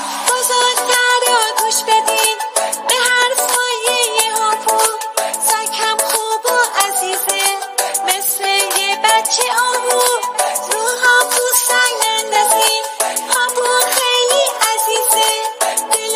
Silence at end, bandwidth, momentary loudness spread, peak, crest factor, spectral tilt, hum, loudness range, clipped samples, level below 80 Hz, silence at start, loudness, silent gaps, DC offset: 0 s; 16 kHz; 5 LU; 0 dBFS; 16 dB; 2.5 dB/octave; none; 2 LU; under 0.1%; -76 dBFS; 0 s; -13 LUFS; none; under 0.1%